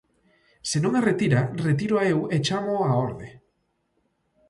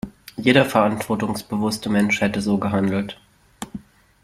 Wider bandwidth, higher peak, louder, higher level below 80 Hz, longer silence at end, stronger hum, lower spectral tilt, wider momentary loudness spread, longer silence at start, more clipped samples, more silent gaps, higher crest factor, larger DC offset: second, 11.5 kHz vs 15.5 kHz; second, -8 dBFS vs -2 dBFS; second, -24 LUFS vs -20 LUFS; second, -58 dBFS vs -52 dBFS; first, 1.15 s vs 0.45 s; neither; about the same, -6 dB/octave vs -5.5 dB/octave; second, 10 LU vs 19 LU; first, 0.65 s vs 0.05 s; neither; neither; about the same, 18 dB vs 20 dB; neither